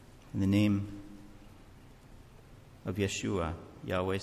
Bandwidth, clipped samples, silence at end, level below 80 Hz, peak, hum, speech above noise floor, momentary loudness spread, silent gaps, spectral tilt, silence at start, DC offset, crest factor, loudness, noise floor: 14.5 kHz; under 0.1%; 0 s; -50 dBFS; -16 dBFS; none; 23 dB; 22 LU; none; -6 dB/octave; 0 s; under 0.1%; 18 dB; -33 LUFS; -54 dBFS